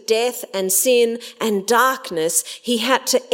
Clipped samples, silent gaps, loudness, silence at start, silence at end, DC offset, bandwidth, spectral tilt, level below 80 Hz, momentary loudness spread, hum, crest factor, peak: under 0.1%; none; -18 LUFS; 0.1 s; 0 s; under 0.1%; 16.5 kHz; -1.5 dB/octave; -72 dBFS; 7 LU; none; 16 dB; -2 dBFS